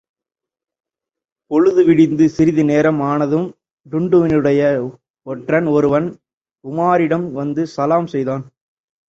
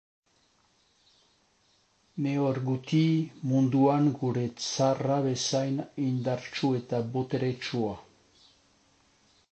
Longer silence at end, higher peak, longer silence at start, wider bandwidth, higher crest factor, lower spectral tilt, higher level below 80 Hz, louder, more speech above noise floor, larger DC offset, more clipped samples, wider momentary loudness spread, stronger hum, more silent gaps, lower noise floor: second, 0.65 s vs 1.55 s; first, -2 dBFS vs -12 dBFS; second, 1.5 s vs 2.15 s; second, 7.6 kHz vs 8.8 kHz; about the same, 14 dB vs 18 dB; first, -8 dB/octave vs -6 dB/octave; first, -54 dBFS vs -68 dBFS; first, -16 LUFS vs -28 LUFS; first, 72 dB vs 40 dB; neither; neither; first, 13 LU vs 8 LU; neither; first, 5.10-5.14 s, 6.37-6.41 s vs none; first, -86 dBFS vs -68 dBFS